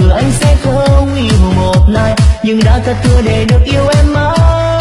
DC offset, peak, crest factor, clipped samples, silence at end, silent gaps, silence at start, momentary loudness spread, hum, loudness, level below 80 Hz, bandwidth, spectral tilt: under 0.1%; 0 dBFS; 8 dB; 0.6%; 0 s; none; 0 s; 1 LU; none; -10 LUFS; -12 dBFS; 11.5 kHz; -6.5 dB/octave